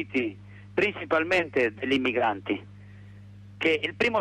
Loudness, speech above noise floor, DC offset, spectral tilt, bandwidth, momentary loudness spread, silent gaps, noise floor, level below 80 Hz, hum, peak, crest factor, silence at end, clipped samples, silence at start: -26 LUFS; 20 dB; under 0.1%; -5.5 dB/octave; 12.5 kHz; 9 LU; none; -47 dBFS; -62 dBFS; 50 Hz at -45 dBFS; -12 dBFS; 14 dB; 0 s; under 0.1%; 0 s